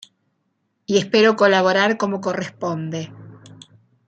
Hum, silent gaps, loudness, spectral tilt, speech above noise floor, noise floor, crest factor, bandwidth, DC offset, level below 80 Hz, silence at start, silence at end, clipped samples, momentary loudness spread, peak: none; none; -18 LUFS; -5 dB/octave; 52 dB; -71 dBFS; 18 dB; 8.8 kHz; under 0.1%; -66 dBFS; 0.9 s; 0.6 s; under 0.1%; 15 LU; -2 dBFS